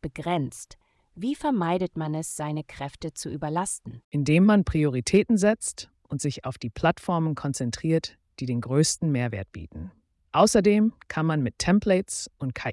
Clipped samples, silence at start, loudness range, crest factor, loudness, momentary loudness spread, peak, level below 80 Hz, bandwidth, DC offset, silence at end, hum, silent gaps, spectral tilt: under 0.1%; 0.05 s; 6 LU; 18 dB; -25 LUFS; 15 LU; -8 dBFS; -50 dBFS; 12 kHz; under 0.1%; 0 s; none; 4.04-4.11 s; -5.5 dB/octave